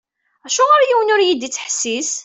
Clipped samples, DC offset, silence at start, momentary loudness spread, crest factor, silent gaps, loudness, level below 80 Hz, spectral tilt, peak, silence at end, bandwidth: under 0.1%; under 0.1%; 0.45 s; 9 LU; 14 dB; none; -15 LUFS; -68 dBFS; 0 dB/octave; -2 dBFS; 0 s; 8.4 kHz